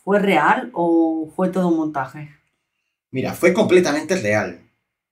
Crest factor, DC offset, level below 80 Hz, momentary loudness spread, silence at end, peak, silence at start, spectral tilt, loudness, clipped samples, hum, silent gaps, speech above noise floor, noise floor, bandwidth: 18 dB; under 0.1%; -60 dBFS; 12 LU; 0.55 s; -2 dBFS; 0.05 s; -6 dB/octave; -18 LUFS; under 0.1%; none; none; 58 dB; -76 dBFS; 16 kHz